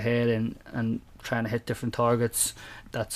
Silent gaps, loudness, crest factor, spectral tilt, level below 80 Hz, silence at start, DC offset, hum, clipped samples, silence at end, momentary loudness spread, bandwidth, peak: none; -28 LUFS; 16 dB; -4.5 dB/octave; -52 dBFS; 0 s; under 0.1%; none; under 0.1%; 0 s; 10 LU; 15.5 kHz; -12 dBFS